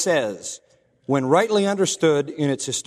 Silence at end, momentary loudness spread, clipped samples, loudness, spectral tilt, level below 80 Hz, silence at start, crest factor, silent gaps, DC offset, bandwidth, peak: 0.05 s; 15 LU; under 0.1%; -21 LUFS; -4 dB/octave; -66 dBFS; 0 s; 18 dB; none; under 0.1%; 13.5 kHz; -4 dBFS